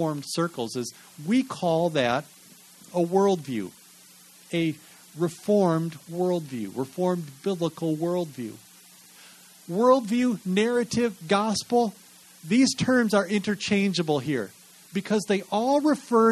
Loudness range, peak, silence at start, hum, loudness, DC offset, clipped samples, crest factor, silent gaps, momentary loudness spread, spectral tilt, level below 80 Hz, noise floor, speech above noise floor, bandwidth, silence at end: 5 LU; -6 dBFS; 0 s; none; -25 LUFS; under 0.1%; under 0.1%; 18 dB; none; 12 LU; -5.5 dB/octave; -66 dBFS; -52 dBFS; 27 dB; 13 kHz; 0 s